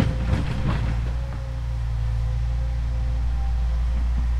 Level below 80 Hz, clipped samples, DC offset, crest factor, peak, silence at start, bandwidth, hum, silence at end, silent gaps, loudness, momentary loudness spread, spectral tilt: -24 dBFS; under 0.1%; under 0.1%; 14 dB; -8 dBFS; 0 s; 7 kHz; none; 0 s; none; -26 LUFS; 4 LU; -7.5 dB/octave